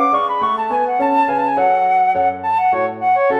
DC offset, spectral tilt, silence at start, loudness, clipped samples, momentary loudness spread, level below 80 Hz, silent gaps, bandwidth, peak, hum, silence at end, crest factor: under 0.1%; -6 dB/octave; 0 s; -16 LUFS; under 0.1%; 3 LU; -60 dBFS; none; 6.2 kHz; -4 dBFS; none; 0 s; 12 dB